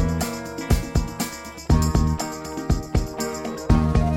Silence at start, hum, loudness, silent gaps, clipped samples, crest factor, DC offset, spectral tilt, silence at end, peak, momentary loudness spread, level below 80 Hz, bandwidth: 0 s; none; -24 LUFS; none; under 0.1%; 16 dB; under 0.1%; -6 dB/octave; 0 s; -6 dBFS; 10 LU; -28 dBFS; 17 kHz